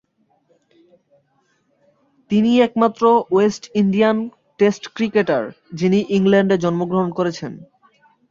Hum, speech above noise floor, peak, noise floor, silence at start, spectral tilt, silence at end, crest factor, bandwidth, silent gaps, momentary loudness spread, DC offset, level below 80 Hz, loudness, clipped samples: none; 45 dB; -2 dBFS; -62 dBFS; 2.3 s; -7 dB/octave; 0.65 s; 18 dB; 7.6 kHz; none; 9 LU; under 0.1%; -60 dBFS; -18 LUFS; under 0.1%